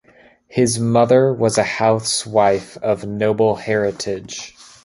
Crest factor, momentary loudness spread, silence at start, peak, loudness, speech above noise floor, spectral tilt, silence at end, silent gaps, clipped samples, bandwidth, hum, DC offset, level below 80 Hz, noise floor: 16 dB; 12 LU; 0.5 s; -2 dBFS; -18 LUFS; 33 dB; -4.5 dB/octave; 0.35 s; none; under 0.1%; 11.5 kHz; none; under 0.1%; -52 dBFS; -50 dBFS